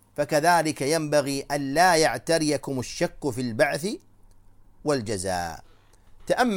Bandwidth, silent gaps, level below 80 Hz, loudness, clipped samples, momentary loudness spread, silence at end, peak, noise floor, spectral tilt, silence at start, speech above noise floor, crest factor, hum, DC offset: 17 kHz; none; -52 dBFS; -24 LUFS; under 0.1%; 12 LU; 0 s; -6 dBFS; -52 dBFS; -4 dB/octave; 0.2 s; 28 dB; 20 dB; none; under 0.1%